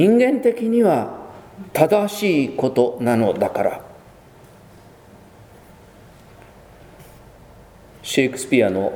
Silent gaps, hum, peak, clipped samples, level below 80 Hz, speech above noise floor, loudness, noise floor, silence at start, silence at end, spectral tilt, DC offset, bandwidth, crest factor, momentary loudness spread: none; none; 0 dBFS; under 0.1%; -56 dBFS; 28 dB; -19 LUFS; -46 dBFS; 0 s; 0 s; -5.5 dB/octave; under 0.1%; 19.5 kHz; 20 dB; 16 LU